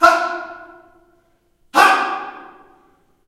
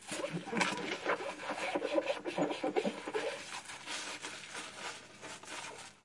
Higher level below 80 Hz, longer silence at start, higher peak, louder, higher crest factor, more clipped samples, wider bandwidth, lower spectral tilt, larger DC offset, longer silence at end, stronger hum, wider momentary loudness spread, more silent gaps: first, -56 dBFS vs -80 dBFS; about the same, 0 s vs 0 s; first, 0 dBFS vs -12 dBFS; first, -16 LUFS vs -38 LUFS; second, 20 dB vs 28 dB; neither; first, 16 kHz vs 11.5 kHz; second, -1.5 dB/octave vs -3.5 dB/octave; neither; first, 0.85 s vs 0.1 s; neither; first, 24 LU vs 10 LU; neither